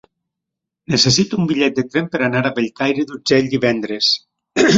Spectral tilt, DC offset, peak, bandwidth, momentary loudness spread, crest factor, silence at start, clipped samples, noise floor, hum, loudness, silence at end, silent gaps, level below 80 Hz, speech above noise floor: -4 dB/octave; under 0.1%; 0 dBFS; 7.8 kHz; 7 LU; 16 dB; 0.9 s; under 0.1%; -82 dBFS; none; -17 LUFS; 0 s; none; -52 dBFS; 65 dB